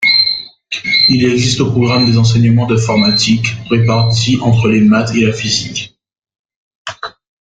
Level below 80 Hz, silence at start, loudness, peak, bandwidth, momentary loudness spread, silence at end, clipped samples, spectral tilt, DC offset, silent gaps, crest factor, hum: -42 dBFS; 0 s; -11 LUFS; 0 dBFS; 9.2 kHz; 15 LU; 0.3 s; under 0.1%; -5 dB/octave; under 0.1%; 6.39-6.44 s, 6.56-6.85 s; 12 dB; none